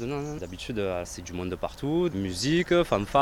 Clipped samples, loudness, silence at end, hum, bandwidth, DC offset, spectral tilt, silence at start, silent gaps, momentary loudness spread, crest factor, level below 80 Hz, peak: under 0.1%; -28 LUFS; 0 s; none; 16 kHz; under 0.1%; -5.5 dB/octave; 0 s; none; 11 LU; 18 dB; -46 dBFS; -8 dBFS